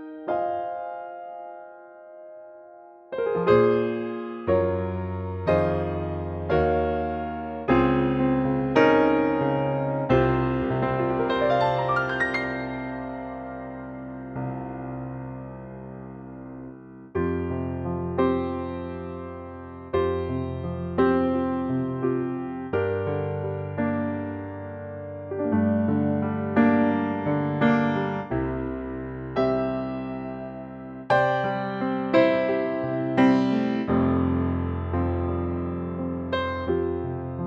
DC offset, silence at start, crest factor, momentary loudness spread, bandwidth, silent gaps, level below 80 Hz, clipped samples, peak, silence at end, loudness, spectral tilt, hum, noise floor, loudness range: under 0.1%; 0 s; 20 dB; 16 LU; 6.8 kHz; none; -46 dBFS; under 0.1%; -6 dBFS; 0 s; -25 LUFS; -9 dB/octave; none; -47 dBFS; 10 LU